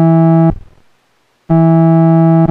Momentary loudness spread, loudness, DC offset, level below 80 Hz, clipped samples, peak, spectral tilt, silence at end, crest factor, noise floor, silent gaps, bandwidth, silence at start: 5 LU; -9 LUFS; under 0.1%; -36 dBFS; under 0.1%; 0 dBFS; -12.5 dB/octave; 0 s; 8 dB; -57 dBFS; none; 3 kHz; 0 s